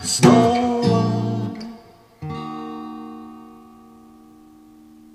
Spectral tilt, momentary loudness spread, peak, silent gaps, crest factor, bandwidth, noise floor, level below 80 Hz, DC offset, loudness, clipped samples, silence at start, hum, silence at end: -5.5 dB/octave; 24 LU; 0 dBFS; none; 22 dB; 14 kHz; -47 dBFS; -56 dBFS; under 0.1%; -19 LUFS; under 0.1%; 0 s; none; 1.55 s